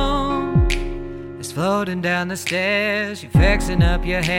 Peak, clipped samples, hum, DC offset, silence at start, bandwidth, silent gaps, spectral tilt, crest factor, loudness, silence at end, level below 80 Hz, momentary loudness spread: -4 dBFS; under 0.1%; none; under 0.1%; 0 s; 16.5 kHz; none; -5.5 dB/octave; 16 dB; -20 LUFS; 0 s; -26 dBFS; 12 LU